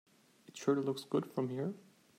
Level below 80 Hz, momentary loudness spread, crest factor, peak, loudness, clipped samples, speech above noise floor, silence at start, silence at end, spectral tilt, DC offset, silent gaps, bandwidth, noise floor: -86 dBFS; 14 LU; 18 dB; -20 dBFS; -37 LUFS; under 0.1%; 24 dB; 0.55 s; 0.4 s; -6.5 dB/octave; under 0.1%; none; 16 kHz; -60 dBFS